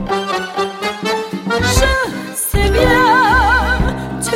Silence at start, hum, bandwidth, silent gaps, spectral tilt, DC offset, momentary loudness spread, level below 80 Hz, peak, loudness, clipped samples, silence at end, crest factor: 0 s; none; 16.5 kHz; none; -4 dB/octave; under 0.1%; 10 LU; -22 dBFS; 0 dBFS; -15 LUFS; under 0.1%; 0 s; 14 dB